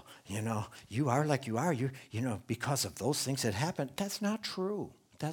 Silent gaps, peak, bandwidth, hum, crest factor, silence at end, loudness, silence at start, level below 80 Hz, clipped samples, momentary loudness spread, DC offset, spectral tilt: none; -14 dBFS; 19.5 kHz; none; 20 dB; 0 s; -35 LUFS; 0.05 s; -68 dBFS; under 0.1%; 8 LU; under 0.1%; -5 dB/octave